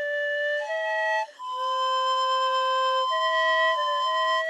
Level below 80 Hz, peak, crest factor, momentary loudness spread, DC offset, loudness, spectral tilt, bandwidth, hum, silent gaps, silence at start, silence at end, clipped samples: under -90 dBFS; -14 dBFS; 12 dB; 5 LU; under 0.1%; -24 LUFS; 3.5 dB/octave; 11 kHz; none; none; 0 s; 0 s; under 0.1%